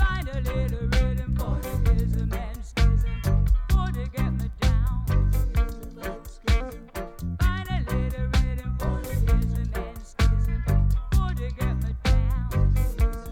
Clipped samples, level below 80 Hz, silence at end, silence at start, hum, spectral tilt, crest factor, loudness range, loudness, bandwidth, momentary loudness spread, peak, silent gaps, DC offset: under 0.1%; -24 dBFS; 0 s; 0 s; none; -6.5 dB/octave; 14 dB; 3 LU; -26 LUFS; 16 kHz; 8 LU; -8 dBFS; none; under 0.1%